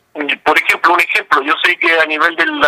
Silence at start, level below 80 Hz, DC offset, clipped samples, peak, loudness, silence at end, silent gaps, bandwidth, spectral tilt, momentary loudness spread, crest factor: 0.15 s; -58 dBFS; under 0.1%; under 0.1%; 0 dBFS; -12 LUFS; 0 s; none; 16.5 kHz; -2 dB/octave; 3 LU; 14 dB